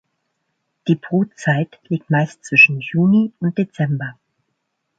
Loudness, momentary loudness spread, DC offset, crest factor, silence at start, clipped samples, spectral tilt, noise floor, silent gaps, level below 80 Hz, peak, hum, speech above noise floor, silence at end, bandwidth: -17 LUFS; 14 LU; under 0.1%; 18 dB; 0.85 s; under 0.1%; -7 dB/octave; -73 dBFS; none; -62 dBFS; 0 dBFS; none; 56 dB; 0.85 s; 9 kHz